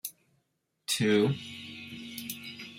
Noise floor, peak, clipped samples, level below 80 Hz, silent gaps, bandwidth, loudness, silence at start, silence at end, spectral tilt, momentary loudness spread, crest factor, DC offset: -78 dBFS; -12 dBFS; under 0.1%; -72 dBFS; none; 16.5 kHz; -30 LUFS; 0.05 s; 0 s; -4.5 dB/octave; 17 LU; 20 dB; under 0.1%